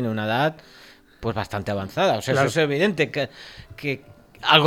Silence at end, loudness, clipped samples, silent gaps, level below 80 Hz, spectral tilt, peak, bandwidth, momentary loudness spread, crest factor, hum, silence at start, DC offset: 0 s; -23 LUFS; under 0.1%; none; -54 dBFS; -5 dB/octave; 0 dBFS; 16.5 kHz; 12 LU; 24 dB; none; 0 s; under 0.1%